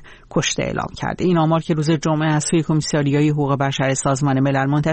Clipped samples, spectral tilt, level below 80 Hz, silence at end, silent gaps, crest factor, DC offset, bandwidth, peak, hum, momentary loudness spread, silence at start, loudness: under 0.1%; -5.5 dB/octave; -46 dBFS; 0 s; none; 12 dB; under 0.1%; 8.8 kHz; -8 dBFS; none; 5 LU; 0 s; -19 LUFS